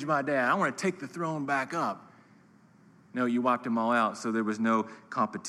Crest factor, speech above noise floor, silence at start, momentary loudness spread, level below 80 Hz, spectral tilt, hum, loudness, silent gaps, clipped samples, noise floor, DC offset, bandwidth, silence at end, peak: 18 dB; 30 dB; 0 s; 8 LU; -84 dBFS; -5.5 dB/octave; none; -29 LUFS; none; under 0.1%; -59 dBFS; under 0.1%; 12 kHz; 0 s; -12 dBFS